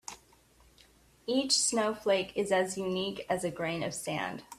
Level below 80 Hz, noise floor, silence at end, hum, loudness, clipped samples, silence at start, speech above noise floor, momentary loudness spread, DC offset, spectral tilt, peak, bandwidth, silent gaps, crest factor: -66 dBFS; -62 dBFS; 0.05 s; none; -31 LUFS; under 0.1%; 0.1 s; 31 dB; 9 LU; under 0.1%; -3 dB/octave; -12 dBFS; 15 kHz; none; 20 dB